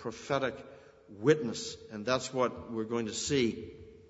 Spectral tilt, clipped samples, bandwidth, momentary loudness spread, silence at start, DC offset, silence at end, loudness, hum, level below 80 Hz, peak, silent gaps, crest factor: -4.5 dB/octave; under 0.1%; 8 kHz; 14 LU; 0 s; under 0.1%; 0.05 s; -32 LUFS; none; -64 dBFS; -12 dBFS; none; 22 dB